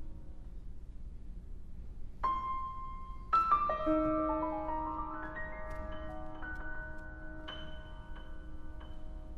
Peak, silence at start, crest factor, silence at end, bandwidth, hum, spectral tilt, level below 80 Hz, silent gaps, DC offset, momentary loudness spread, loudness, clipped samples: -18 dBFS; 0 s; 20 dB; 0 s; 6.2 kHz; none; -7.5 dB/octave; -46 dBFS; none; under 0.1%; 21 LU; -36 LUFS; under 0.1%